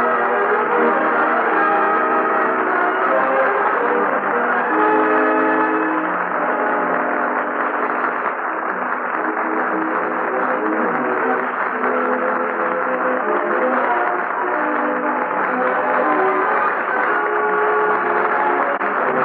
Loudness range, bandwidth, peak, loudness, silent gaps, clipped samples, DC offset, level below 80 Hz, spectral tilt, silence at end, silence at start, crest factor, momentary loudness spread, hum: 3 LU; 4.8 kHz; -6 dBFS; -18 LUFS; none; under 0.1%; under 0.1%; -80 dBFS; -3 dB/octave; 0 s; 0 s; 12 dB; 4 LU; none